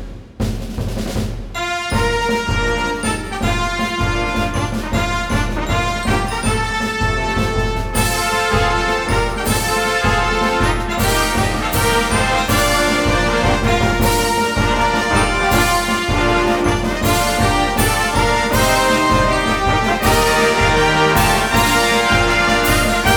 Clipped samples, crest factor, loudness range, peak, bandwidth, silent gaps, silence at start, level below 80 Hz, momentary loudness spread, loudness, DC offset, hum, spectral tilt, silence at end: under 0.1%; 16 dB; 5 LU; 0 dBFS; over 20 kHz; none; 0 s; -26 dBFS; 6 LU; -16 LUFS; under 0.1%; none; -4 dB/octave; 0 s